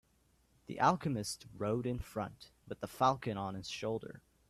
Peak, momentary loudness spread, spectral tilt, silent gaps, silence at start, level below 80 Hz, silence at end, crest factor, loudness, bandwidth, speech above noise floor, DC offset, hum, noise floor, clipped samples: -16 dBFS; 15 LU; -5.5 dB/octave; none; 0.7 s; -60 dBFS; 0.3 s; 22 dB; -37 LUFS; 15.5 kHz; 36 dB; under 0.1%; none; -72 dBFS; under 0.1%